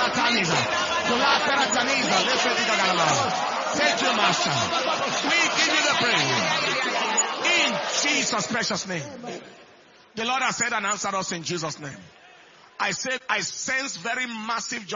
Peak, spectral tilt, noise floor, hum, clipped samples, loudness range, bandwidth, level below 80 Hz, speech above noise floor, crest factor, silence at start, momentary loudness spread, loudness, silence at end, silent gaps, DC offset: -4 dBFS; -2 dB/octave; -52 dBFS; none; under 0.1%; 7 LU; 7.6 kHz; -64 dBFS; 28 dB; 20 dB; 0 s; 9 LU; -22 LUFS; 0 s; none; under 0.1%